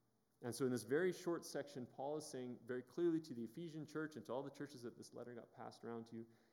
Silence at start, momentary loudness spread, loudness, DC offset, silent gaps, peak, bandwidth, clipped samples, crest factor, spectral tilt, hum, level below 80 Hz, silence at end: 0.4 s; 14 LU; -47 LUFS; under 0.1%; none; -26 dBFS; 17.5 kHz; under 0.1%; 20 dB; -5.5 dB/octave; none; under -90 dBFS; 0.2 s